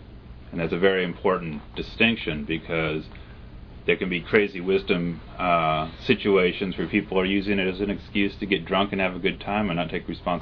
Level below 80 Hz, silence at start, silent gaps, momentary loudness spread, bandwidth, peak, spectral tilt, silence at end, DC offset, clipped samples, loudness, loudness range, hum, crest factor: -44 dBFS; 0 s; none; 11 LU; 5.4 kHz; -4 dBFS; -8 dB/octave; 0 s; under 0.1%; under 0.1%; -24 LUFS; 2 LU; none; 20 dB